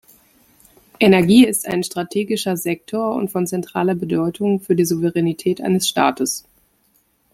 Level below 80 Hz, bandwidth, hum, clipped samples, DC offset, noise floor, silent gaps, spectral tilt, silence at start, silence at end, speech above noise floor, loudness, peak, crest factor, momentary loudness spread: -58 dBFS; 16.5 kHz; none; under 0.1%; under 0.1%; -61 dBFS; none; -5 dB/octave; 1 s; 0.95 s; 44 dB; -18 LUFS; -2 dBFS; 18 dB; 10 LU